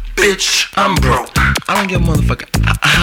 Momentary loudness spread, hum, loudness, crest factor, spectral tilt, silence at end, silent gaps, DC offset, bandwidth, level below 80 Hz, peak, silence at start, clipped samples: 4 LU; none; -13 LUFS; 14 dB; -4 dB/octave; 0 s; none; under 0.1%; 18 kHz; -22 dBFS; 0 dBFS; 0 s; under 0.1%